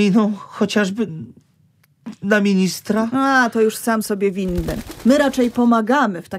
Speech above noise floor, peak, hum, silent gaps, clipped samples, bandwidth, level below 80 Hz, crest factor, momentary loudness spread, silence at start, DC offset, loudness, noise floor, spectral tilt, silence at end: 40 dB; 0 dBFS; none; none; under 0.1%; 16 kHz; -40 dBFS; 18 dB; 10 LU; 0 s; under 0.1%; -18 LUFS; -58 dBFS; -5.5 dB/octave; 0 s